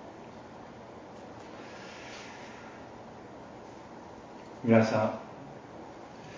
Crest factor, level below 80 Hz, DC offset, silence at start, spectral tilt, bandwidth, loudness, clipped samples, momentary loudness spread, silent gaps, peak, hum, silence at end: 26 dB; -66 dBFS; under 0.1%; 0 s; -7 dB/octave; 7.6 kHz; -30 LUFS; under 0.1%; 22 LU; none; -8 dBFS; none; 0 s